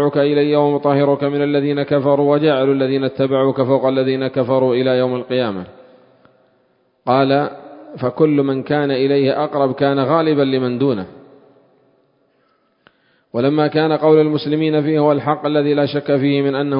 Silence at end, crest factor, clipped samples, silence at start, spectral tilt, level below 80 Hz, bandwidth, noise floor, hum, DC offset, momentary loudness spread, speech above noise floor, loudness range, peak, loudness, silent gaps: 0 s; 16 dB; under 0.1%; 0 s; -12 dB/octave; -60 dBFS; 5.4 kHz; -61 dBFS; none; under 0.1%; 5 LU; 45 dB; 5 LU; 0 dBFS; -16 LUFS; none